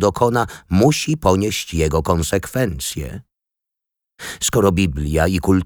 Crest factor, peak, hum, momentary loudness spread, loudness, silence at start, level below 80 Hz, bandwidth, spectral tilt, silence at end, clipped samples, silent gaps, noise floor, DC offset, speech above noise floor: 16 dB; -2 dBFS; none; 11 LU; -18 LUFS; 0 s; -32 dBFS; over 20 kHz; -5 dB/octave; 0 s; under 0.1%; none; -84 dBFS; under 0.1%; 66 dB